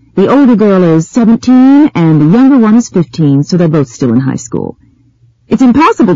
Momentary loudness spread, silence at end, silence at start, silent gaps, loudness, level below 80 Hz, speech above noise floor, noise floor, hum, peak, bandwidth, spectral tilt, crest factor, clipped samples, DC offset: 9 LU; 0 s; 0.15 s; none; -7 LUFS; -42 dBFS; 40 dB; -47 dBFS; none; 0 dBFS; 7.8 kHz; -7.5 dB/octave; 8 dB; 0.2%; 0.5%